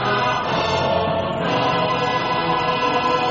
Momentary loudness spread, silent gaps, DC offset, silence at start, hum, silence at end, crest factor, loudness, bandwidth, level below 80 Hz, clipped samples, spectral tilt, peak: 2 LU; none; under 0.1%; 0 s; none; 0 s; 12 dB; -20 LUFS; 7.6 kHz; -48 dBFS; under 0.1%; -3 dB/octave; -8 dBFS